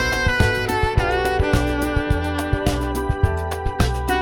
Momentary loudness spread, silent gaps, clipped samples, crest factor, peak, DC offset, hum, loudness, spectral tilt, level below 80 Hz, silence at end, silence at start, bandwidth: 4 LU; none; under 0.1%; 16 dB; -4 dBFS; under 0.1%; none; -21 LUFS; -5.5 dB/octave; -26 dBFS; 0 s; 0 s; 18.5 kHz